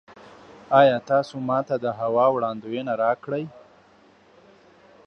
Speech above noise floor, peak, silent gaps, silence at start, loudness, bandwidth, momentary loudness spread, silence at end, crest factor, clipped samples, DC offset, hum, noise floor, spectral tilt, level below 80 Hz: 33 dB; -4 dBFS; none; 0.1 s; -23 LUFS; 8 kHz; 13 LU; 1.5 s; 20 dB; under 0.1%; under 0.1%; none; -55 dBFS; -7 dB/octave; -70 dBFS